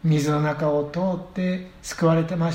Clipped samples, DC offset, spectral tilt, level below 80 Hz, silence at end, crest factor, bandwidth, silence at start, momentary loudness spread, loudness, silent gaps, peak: under 0.1%; under 0.1%; -7 dB/octave; -50 dBFS; 0 s; 14 dB; 15.5 kHz; 0.05 s; 6 LU; -23 LUFS; none; -8 dBFS